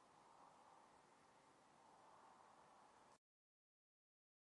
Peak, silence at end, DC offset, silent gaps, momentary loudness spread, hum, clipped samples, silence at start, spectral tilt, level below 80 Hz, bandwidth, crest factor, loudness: -56 dBFS; 1.4 s; under 0.1%; none; 1 LU; none; under 0.1%; 0 s; -3 dB/octave; under -90 dBFS; 11 kHz; 16 dB; -69 LUFS